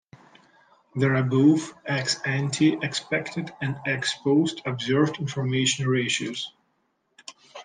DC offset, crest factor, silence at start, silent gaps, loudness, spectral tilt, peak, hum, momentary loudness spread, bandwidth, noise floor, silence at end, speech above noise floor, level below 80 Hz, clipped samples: under 0.1%; 18 dB; 0.95 s; none; -24 LUFS; -5 dB/octave; -8 dBFS; none; 13 LU; 10 kHz; -72 dBFS; 0 s; 48 dB; -68 dBFS; under 0.1%